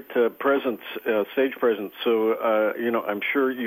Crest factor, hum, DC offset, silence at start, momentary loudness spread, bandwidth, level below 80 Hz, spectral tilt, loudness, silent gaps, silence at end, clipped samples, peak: 14 dB; none; under 0.1%; 0 s; 4 LU; 15.5 kHz; -76 dBFS; -7 dB/octave; -24 LUFS; none; 0 s; under 0.1%; -10 dBFS